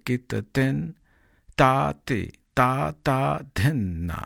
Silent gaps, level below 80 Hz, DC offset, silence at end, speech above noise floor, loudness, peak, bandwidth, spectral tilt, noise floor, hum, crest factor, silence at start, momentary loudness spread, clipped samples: none; -46 dBFS; under 0.1%; 0 s; 33 dB; -24 LUFS; -4 dBFS; 16.5 kHz; -6.5 dB/octave; -57 dBFS; none; 20 dB; 0.05 s; 9 LU; under 0.1%